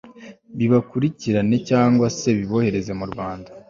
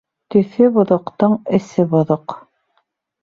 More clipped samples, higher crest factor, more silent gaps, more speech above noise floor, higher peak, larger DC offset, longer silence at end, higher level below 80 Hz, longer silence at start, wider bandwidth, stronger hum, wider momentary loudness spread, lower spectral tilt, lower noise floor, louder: neither; about the same, 16 dB vs 16 dB; neither; second, 23 dB vs 51 dB; about the same, -4 dBFS vs -2 dBFS; neither; second, 0.1 s vs 0.85 s; first, -50 dBFS vs -58 dBFS; second, 0.05 s vs 0.3 s; about the same, 7.4 kHz vs 7.2 kHz; neither; first, 11 LU vs 7 LU; second, -7 dB/octave vs -9 dB/octave; second, -43 dBFS vs -67 dBFS; second, -20 LUFS vs -16 LUFS